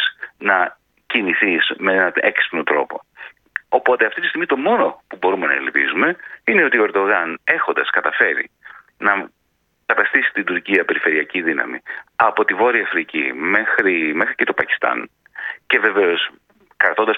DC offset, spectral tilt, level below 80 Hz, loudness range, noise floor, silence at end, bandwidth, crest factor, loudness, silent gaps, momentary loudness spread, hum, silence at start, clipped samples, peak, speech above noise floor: under 0.1%; -6 dB/octave; -68 dBFS; 2 LU; -66 dBFS; 0 s; 5.2 kHz; 18 dB; -17 LUFS; none; 9 LU; none; 0 s; under 0.1%; 0 dBFS; 49 dB